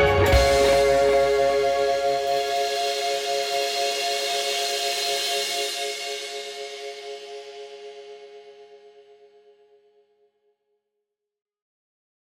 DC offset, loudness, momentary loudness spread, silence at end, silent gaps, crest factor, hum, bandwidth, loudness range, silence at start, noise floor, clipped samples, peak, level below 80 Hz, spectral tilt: under 0.1%; -22 LUFS; 20 LU; 3.35 s; none; 20 dB; none; 17 kHz; 20 LU; 0 s; -82 dBFS; under 0.1%; -6 dBFS; -38 dBFS; -3 dB/octave